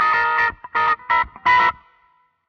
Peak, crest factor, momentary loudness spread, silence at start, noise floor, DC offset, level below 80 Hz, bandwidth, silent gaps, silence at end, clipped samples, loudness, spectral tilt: -6 dBFS; 14 dB; 5 LU; 0 s; -60 dBFS; under 0.1%; -50 dBFS; 6.8 kHz; none; 0.75 s; under 0.1%; -18 LUFS; -3 dB/octave